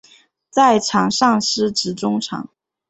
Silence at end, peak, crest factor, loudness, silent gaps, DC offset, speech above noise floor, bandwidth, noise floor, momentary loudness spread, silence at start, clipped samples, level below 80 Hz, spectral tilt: 0.45 s; -2 dBFS; 18 dB; -17 LUFS; none; under 0.1%; 35 dB; 8.2 kHz; -52 dBFS; 12 LU; 0.55 s; under 0.1%; -60 dBFS; -3.5 dB/octave